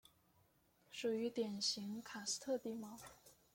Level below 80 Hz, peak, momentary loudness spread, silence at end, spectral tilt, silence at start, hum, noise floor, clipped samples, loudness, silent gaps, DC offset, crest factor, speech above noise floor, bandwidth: -82 dBFS; -28 dBFS; 14 LU; 0.2 s; -3 dB/octave; 0.9 s; none; -75 dBFS; under 0.1%; -43 LUFS; none; under 0.1%; 18 dB; 32 dB; 16.5 kHz